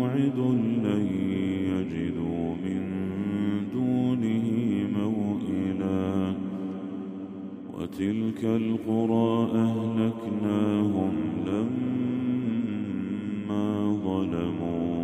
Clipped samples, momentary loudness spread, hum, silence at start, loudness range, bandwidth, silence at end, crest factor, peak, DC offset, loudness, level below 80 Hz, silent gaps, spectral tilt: under 0.1%; 7 LU; none; 0 s; 4 LU; 8.8 kHz; 0 s; 14 dB; -12 dBFS; under 0.1%; -28 LUFS; -60 dBFS; none; -8.5 dB/octave